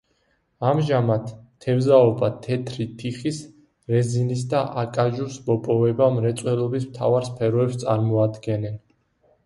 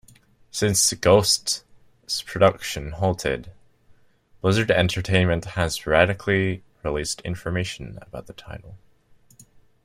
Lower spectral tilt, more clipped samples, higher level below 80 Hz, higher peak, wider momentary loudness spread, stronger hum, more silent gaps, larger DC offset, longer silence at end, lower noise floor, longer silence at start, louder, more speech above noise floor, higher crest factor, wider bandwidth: first, -7.5 dB/octave vs -4 dB/octave; neither; second, -58 dBFS vs -46 dBFS; about the same, -4 dBFS vs -2 dBFS; second, 10 LU vs 18 LU; neither; neither; neither; second, 0.65 s vs 1.1 s; first, -67 dBFS vs -57 dBFS; about the same, 0.6 s vs 0.55 s; about the same, -22 LUFS vs -22 LUFS; first, 46 dB vs 35 dB; about the same, 18 dB vs 22 dB; second, 11.5 kHz vs 15.5 kHz